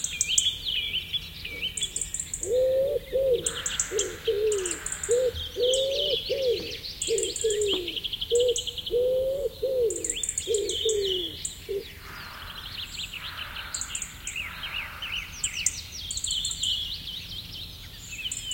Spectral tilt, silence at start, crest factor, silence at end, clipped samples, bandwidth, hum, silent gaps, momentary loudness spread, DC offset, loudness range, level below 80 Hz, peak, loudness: -1 dB/octave; 0 s; 24 dB; 0 s; under 0.1%; 17 kHz; none; none; 11 LU; under 0.1%; 6 LU; -50 dBFS; -4 dBFS; -28 LUFS